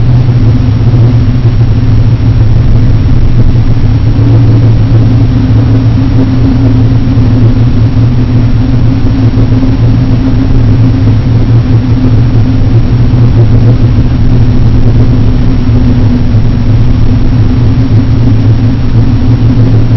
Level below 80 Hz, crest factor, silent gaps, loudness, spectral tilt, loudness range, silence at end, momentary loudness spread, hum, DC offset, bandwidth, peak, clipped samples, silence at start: -10 dBFS; 4 dB; none; -7 LUFS; -10 dB/octave; 1 LU; 0 s; 2 LU; none; 1%; 5.4 kHz; 0 dBFS; 10%; 0 s